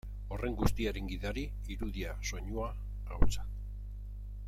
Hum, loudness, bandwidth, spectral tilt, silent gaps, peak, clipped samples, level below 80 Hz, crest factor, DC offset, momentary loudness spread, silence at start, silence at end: 50 Hz at -40 dBFS; -39 LUFS; 14.5 kHz; -5.5 dB/octave; none; -10 dBFS; under 0.1%; -38 dBFS; 24 dB; under 0.1%; 12 LU; 0.05 s; 0 s